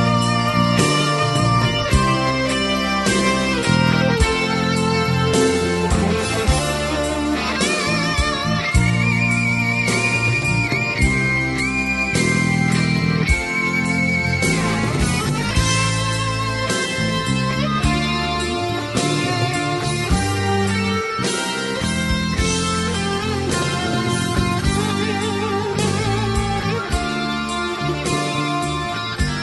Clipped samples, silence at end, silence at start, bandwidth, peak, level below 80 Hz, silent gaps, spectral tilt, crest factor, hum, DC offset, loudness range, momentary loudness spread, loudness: under 0.1%; 0 s; 0 s; 12 kHz; -4 dBFS; -30 dBFS; none; -4.5 dB/octave; 16 dB; none; under 0.1%; 3 LU; 4 LU; -19 LUFS